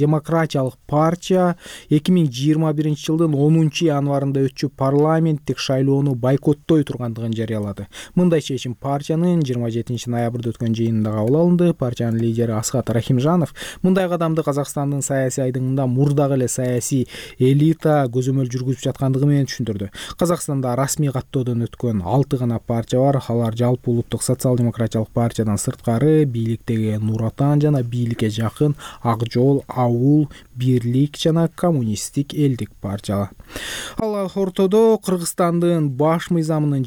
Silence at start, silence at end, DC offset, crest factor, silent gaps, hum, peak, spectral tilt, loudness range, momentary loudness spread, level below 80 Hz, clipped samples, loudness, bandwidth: 0 s; 0 s; under 0.1%; 12 dB; none; none; -8 dBFS; -6.5 dB/octave; 3 LU; 8 LU; -48 dBFS; under 0.1%; -19 LUFS; 18 kHz